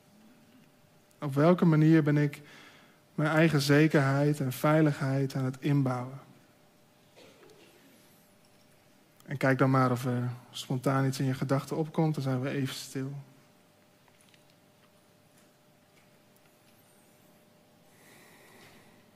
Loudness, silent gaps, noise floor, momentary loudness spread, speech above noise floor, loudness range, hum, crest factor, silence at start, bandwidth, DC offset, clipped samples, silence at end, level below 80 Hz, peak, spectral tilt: -28 LUFS; none; -63 dBFS; 15 LU; 35 dB; 12 LU; none; 20 dB; 1.2 s; 15.5 kHz; under 0.1%; under 0.1%; 5.9 s; -74 dBFS; -10 dBFS; -7 dB/octave